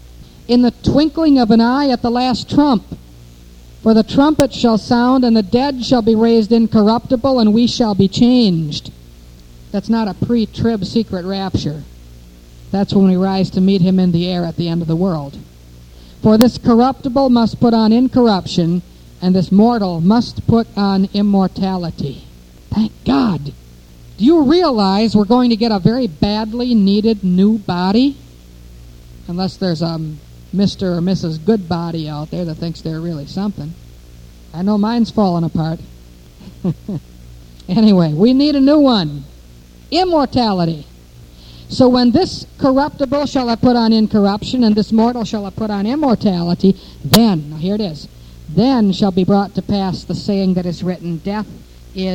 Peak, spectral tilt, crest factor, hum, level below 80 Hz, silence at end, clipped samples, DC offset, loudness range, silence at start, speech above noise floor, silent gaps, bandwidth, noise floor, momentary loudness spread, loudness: 0 dBFS; -7 dB/octave; 14 dB; 60 Hz at -40 dBFS; -38 dBFS; 0 s; under 0.1%; under 0.1%; 6 LU; 0.05 s; 26 dB; none; 19 kHz; -40 dBFS; 12 LU; -15 LUFS